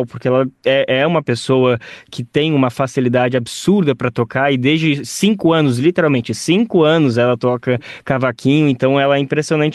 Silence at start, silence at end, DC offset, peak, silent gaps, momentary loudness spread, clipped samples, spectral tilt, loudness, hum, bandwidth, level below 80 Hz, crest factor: 0 s; 0 s; under 0.1%; -2 dBFS; none; 5 LU; under 0.1%; -6 dB/octave; -15 LUFS; none; 12.5 kHz; -56 dBFS; 14 dB